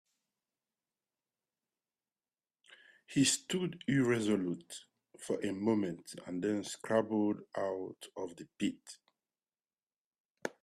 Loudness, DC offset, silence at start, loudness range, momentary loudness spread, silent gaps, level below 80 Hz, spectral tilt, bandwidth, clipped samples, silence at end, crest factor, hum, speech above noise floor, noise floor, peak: -35 LUFS; under 0.1%; 3.1 s; 6 LU; 16 LU; 9.83-9.87 s, 9.96-10.11 s, 10.20-10.35 s; -76 dBFS; -4.5 dB/octave; 13.5 kHz; under 0.1%; 0.1 s; 20 dB; none; over 55 dB; under -90 dBFS; -18 dBFS